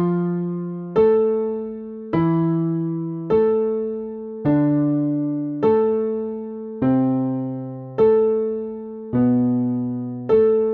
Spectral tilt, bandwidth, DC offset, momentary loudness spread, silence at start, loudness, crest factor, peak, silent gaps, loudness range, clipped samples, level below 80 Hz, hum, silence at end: -10 dB/octave; 4.3 kHz; under 0.1%; 12 LU; 0 s; -21 LUFS; 12 dB; -6 dBFS; none; 1 LU; under 0.1%; -54 dBFS; none; 0 s